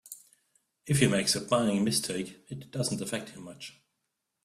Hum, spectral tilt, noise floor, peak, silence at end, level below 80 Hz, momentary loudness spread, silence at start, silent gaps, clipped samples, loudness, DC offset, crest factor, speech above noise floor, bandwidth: none; -4 dB/octave; -82 dBFS; -10 dBFS; 0.75 s; -62 dBFS; 20 LU; 0.05 s; none; under 0.1%; -29 LUFS; under 0.1%; 20 dB; 53 dB; 15 kHz